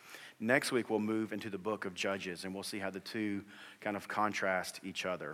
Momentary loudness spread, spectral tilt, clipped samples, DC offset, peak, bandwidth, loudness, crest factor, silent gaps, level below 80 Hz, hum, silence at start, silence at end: 9 LU; -4 dB/octave; under 0.1%; under 0.1%; -14 dBFS; 16.5 kHz; -37 LUFS; 24 dB; none; -82 dBFS; none; 0 s; 0 s